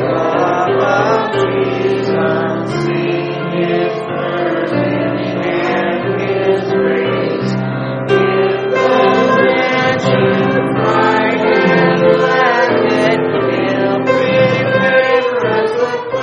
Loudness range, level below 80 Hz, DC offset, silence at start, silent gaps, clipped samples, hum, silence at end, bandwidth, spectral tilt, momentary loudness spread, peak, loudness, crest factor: 4 LU; -50 dBFS; under 0.1%; 0 s; none; under 0.1%; none; 0 s; 8.2 kHz; -6.5 dB/octave; 6 LU; 0 dBFS; -13 LUFS; 14 dB